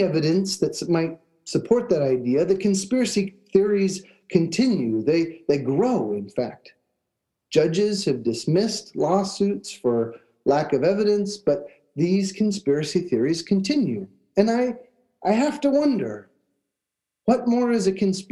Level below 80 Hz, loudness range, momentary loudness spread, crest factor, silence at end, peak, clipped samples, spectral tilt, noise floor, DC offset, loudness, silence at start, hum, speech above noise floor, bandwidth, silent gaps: -64 dBFS; 2 LU; 7 LU; 18 dB; 0.05 s; -4 dBFS; under 0.1%; -6 dB/octave; -85 dBFS; under 0.1%; -23 LUFS; 0 s; none; 63 dB; 12.5 kHz; none